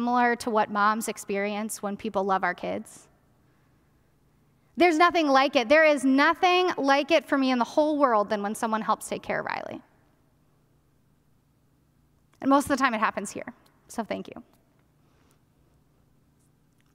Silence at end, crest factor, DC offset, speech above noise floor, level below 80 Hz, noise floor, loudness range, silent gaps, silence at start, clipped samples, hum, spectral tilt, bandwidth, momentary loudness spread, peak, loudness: 2.55 s; 20 dB; under 0.1%; 41 dB; -64 dBFS; -65 dBFS; 16 LU; none; 0 s; under 0.1%; none; -4 dB/octave; 16 kHz; 16 LU; -6 dBFS; -24 LUFS